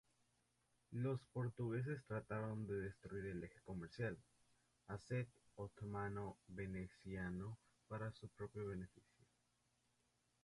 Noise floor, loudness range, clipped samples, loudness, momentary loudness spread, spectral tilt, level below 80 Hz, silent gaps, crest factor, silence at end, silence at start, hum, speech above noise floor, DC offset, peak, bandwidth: -83 dBFS; 5 LU; under 0.1%; -49 LUFS; 9 LU; -8 dB/octave; -70 dBFS; none; 18 dB; 1.45 s; 0.9 s; 60 Hz at -70 dBFS; 35 dB; under 0.1%; -32 dBFS; 11.5 kHz